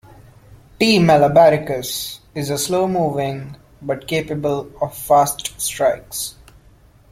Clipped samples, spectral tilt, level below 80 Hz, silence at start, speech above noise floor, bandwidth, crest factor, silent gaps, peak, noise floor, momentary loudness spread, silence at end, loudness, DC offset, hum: under 0.1%; -4.5 dB/octave; -48 dBFS; 0.8 s; 32 dB; 16.5 kHz; 18 dB; none; -2 dBFS; -49 dBFS; 14 LU; 0.8 s; -18 LUFS; under 0.1%; none